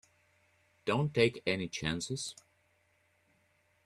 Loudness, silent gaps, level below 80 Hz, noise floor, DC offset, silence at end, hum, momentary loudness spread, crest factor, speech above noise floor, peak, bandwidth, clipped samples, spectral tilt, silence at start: -33 LUFS; none; -64 dBFS; -72 dBFS; under 0.1%; 1.5 s; none; 11 LU; 24 dB; 40 dB; -12 dBFS; 13 kHz; under 0.1%; -4.5 dB/octave; 0.85 s